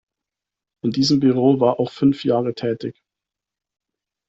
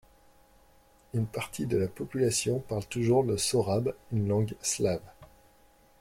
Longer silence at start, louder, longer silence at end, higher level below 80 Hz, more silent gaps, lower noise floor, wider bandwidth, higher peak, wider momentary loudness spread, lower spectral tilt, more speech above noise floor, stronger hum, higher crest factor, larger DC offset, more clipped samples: second, 0.85 s vs 1.15 s; first, -19 LUFS vs -30 LUFS; first, 1.4 s vs 0.75 s; about the same, -60 dBFS vs -58 dBFS; neither; first, -87 dBFS vs -61 dBFS; second, 8 kHz vs 16.5 kHz; first, -4 dBFS vs -14 dBFS; first, 11 LU vs 8 LU; first, -6.5 dB/octave vs -5 dB/octave; first, 69 dB vs 32 dB; neither; about the same, 18 dB vs 16 dB; neither; neither